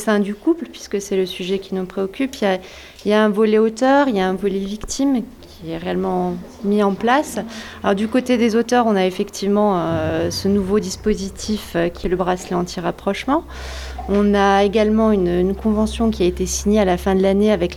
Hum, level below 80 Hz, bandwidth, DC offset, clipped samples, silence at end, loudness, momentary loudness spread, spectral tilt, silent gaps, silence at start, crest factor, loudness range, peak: none; -38 dBFS; 14 kHz; under 0.1%; under 0.1%; 0 s; -19 LUFS; 10 LU; -5.5 dB/octave; none; 0 s; 14 dB; 4 LU; -4 dBFS